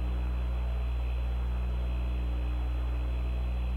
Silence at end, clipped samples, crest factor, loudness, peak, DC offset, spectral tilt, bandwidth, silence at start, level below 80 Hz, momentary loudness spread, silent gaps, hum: 0 s; under 0.1%; 6 dB; -33 LUFS; -24 dBFS; under 0.1%; -8 dB/octave; 4.3 kHz; 0 s; -30 dBFS; 0 LU; none; 60 Hz at -30 dBFS